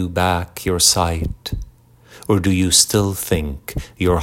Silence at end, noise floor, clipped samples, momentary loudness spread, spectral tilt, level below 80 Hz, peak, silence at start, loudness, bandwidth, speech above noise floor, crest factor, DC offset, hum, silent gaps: 0 s; -47 dBFS; under 0.1%; 16 LU; -3.5 dB/octave; -34 dBFS; 0 dBFS; 0 s; -17 LUFS; 17 kHz; 28 dB; 18 dB; under 0.1%; none; none